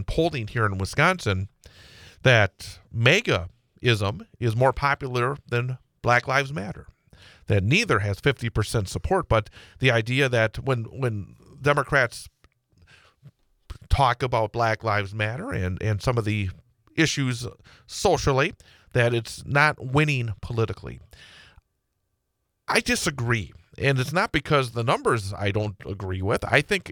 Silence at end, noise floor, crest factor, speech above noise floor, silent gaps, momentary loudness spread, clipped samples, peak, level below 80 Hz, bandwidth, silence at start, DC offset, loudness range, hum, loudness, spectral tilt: 0 s; -77 dBFS; 22 dB; 53 dB; none; 11 LU; under 0.1%; -2 dBFS; -44 dBFS; 19 kHz; 0 s; under 0.1%; 4 LU; none; -24 LUFS; -5 dB/octave